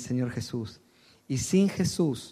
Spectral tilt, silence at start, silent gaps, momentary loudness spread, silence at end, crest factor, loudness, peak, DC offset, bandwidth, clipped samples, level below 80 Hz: -5.5 dB/octave; 0 s; none; 12 LU; 0 s; 16 dB; -28 LUFS; -12 dBFS; under 0.1%; 14.5 kHz; under 0.1%; -56 dBFS